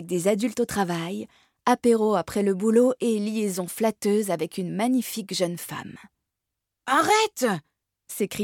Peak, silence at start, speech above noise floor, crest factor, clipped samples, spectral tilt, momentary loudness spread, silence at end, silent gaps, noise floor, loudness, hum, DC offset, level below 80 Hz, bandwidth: -8 dBFS; 0 s; 60 dB; 18 dB; under 0.1%; -4.5 dB/octave; 13 LU; 0 s; none; -84 dBFS; -24 LUFS; none; under 0.1%; -64 dBFS; 18.5 kHz